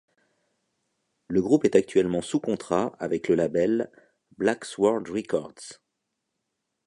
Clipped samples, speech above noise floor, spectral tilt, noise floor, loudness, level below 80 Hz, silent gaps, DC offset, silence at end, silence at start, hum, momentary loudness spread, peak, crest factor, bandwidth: under 0.1%; 56 dB; -6 dB/octave; -81 dBFS; -25 LUFS; -60 dBFS; none; under 0.1%; 1.15 s; 1.3 s; none; 9 LU; -4 dBFS; 22 dB; 11 kHz